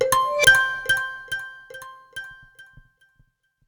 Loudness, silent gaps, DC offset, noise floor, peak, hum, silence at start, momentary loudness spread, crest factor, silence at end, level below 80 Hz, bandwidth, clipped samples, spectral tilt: -19 LUFS; none; under 0.1%; -63 dBFS; -2 dBFS; none; 0 s; 25 LU; 22 dB; 1.05 s; -52 dBFS; over 20 kHz; under 0.1%; -0.5 dB/octave